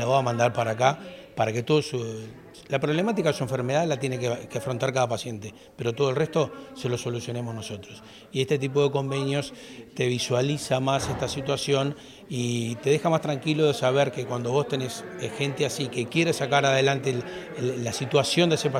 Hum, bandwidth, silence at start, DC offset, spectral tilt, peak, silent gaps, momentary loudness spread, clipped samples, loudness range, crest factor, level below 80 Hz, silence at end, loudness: none; 15.5 kHz; 0 s; under 0.1%; -5 dB/octave; -6 dBFS; none; 13 LU; under 0.1%; 3 LU; 20 dB; -60 dBFS; 0 s; -26 LUFS